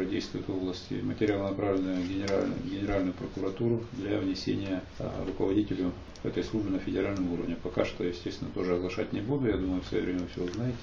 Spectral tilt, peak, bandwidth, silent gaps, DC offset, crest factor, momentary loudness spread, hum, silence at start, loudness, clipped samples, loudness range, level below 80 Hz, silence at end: -7 dB/octave; -12 dBFS; 7.4 kHz; none; under 0.1%; 20 dB; 6 LU; none; 0 s; -32 LUFS; under 0.1%; 1 LU; -48 dBFS; 0 s